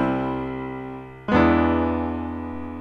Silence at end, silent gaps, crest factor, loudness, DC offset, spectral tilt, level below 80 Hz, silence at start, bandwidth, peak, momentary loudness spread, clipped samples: 0 s; none; 18 dB; -23 LUFS; under 0.1%; -8.5 dB/octave; -38 dBFS; 0 s; 6.4 kHz; -6 dBFS; 15 LU; under 0.1%